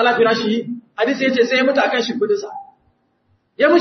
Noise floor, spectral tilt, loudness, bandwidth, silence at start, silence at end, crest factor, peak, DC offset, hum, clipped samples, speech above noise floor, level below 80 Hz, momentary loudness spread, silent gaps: -63 dBFS; -4.5 dB/octave; -17 LUFS; 6.4 kHz; 0 s; 0 s; 16 dB; -2 dBFS; under 0.1%; none; under 0.1%; 46 dB; -68 dBFS; 10 LU; none